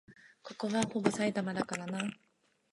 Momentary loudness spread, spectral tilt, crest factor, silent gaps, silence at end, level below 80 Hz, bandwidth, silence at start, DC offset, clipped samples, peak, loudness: 10 LU; -5 dB/octave; 22 dB; none; 0.6 s; -72 dBFS; 11.5 kHz; 0.1 s; under 0.1%; under 0.1%; -14 dBFS; -34 LUFS